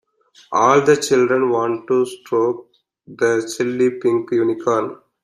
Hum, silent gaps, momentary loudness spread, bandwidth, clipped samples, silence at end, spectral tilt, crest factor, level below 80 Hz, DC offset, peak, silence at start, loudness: none; none; 8 LU; 13.5 kHz; under 0.1%; 0.3 s; -5 dB/octave; 18 dB; -64 dBFS; under 0.1%; 0 dBFS; 0.5 s; -18 LUFS